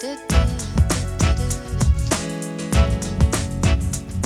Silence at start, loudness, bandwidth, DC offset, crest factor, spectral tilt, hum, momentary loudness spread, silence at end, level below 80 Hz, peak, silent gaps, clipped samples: 0 s; -21 LUFS; 13.5 kHz; under 0.1%; 16 dB; -5 dB/octave; none; 4 LU; 0 s; -24 dBFS; -4 dBFS; none; under 0.1%